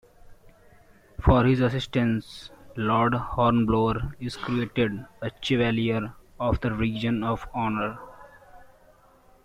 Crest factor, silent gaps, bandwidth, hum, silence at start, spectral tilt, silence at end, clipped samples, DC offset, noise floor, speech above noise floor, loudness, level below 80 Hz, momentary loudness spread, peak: 20 dB; none; 11.5 kHz; none; 0.3 s; -7.5 dB/octave; 0.8 s; under 0.1%; under 0.1%; -57 dBFS; 32 dB; -25 LUFS; -40 dBFS; 14 LU; -6 dBFS